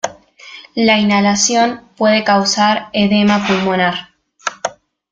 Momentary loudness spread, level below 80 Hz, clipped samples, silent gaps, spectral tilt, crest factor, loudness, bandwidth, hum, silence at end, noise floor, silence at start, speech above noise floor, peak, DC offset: 14 LU; -54 dBFS; under 0.1%; none; -3.5 dB/octave; 14 dB; -14 LUFS; 9 kHz; none; 0.4 s; -38 dBFS; 0.05 s; 25 dB; 0 dBFS; under 0.1%